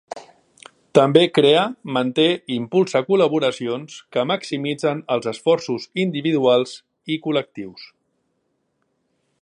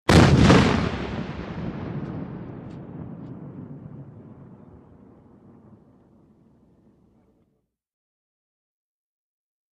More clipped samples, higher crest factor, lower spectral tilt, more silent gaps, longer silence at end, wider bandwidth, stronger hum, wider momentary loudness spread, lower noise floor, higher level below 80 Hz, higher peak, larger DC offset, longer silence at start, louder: neither; about the same, 20 dB vs 24 dB; about the same, -5.5 dB/octave vs -6 dB/octave; neither; second, 1.6 s vs 5.4 s; second, 11 kHz vs 13 kHz; neither; second, 14 LU vs 26 LU; about the same, -71 dBFS vs -72 dBFS; second, -68 dBFS vs -38 dBFS; about the same, 0 dBFS vs -2 dBFS; neither; about the same, 0.15 s vs 0.1 s; about the same, -20 LUFS vs -21 LUFS